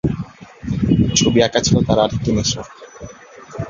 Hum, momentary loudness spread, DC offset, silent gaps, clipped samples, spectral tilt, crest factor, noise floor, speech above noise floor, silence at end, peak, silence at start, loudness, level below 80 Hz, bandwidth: none; 22 LU; under 0.1%; none; under 0.1%; -5 dB/octave; 18 dB; -39 dBFS; 23 dB; 0 s; 0 dBFS; 0.05 s; -16 LUFS; -36 dBFS; 7.6 kHz